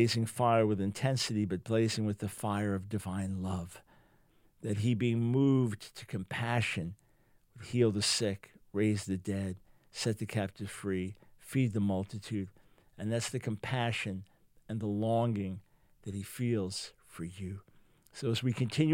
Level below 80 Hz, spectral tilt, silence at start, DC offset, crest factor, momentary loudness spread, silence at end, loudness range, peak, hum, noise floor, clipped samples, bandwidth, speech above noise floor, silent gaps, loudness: -66 dBFS; -5.5 dB/octave; 0 s; under 0.1%; 20 dB; 15 LU; 0 s; 4 LU; -14 dBFS; none; -67 dBFS; under 0.1%; 16.5 kHz; 34 dB; none; -33 LUFS